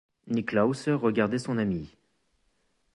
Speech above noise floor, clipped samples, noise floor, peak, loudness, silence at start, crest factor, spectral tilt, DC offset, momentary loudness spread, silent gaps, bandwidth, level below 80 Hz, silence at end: 45 dB; under 0.1%; -72 dBFS; -10 dBFS; -28 LUFS; 0.25 s; 20 dB; -7 dB/octave; under 0.1%; 8 LU; none; 11.5 kHz; -60 dBFS; 1.1 s